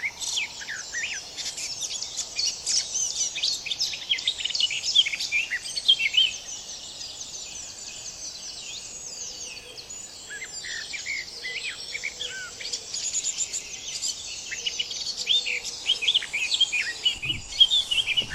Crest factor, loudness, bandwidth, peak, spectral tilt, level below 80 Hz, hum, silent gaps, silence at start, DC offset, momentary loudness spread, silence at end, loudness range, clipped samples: 22 dB; -25 LUFS; 16 kHz; -6 dBFS; 2 dB/octave; -58 dBFS; none; none; 0 s; under 0.1%; 15 LU; 0 s; 12 LU; under 0.1%